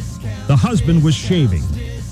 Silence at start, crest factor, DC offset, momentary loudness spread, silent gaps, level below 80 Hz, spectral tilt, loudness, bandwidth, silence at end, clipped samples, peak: 0 s; 14 dB; under 0.1%; 11 LU; none; -28 dBFS; -6.5 dB/octave; -16 LUFS; 13 kHz; 0 s; under 0.1%; -2 dBFS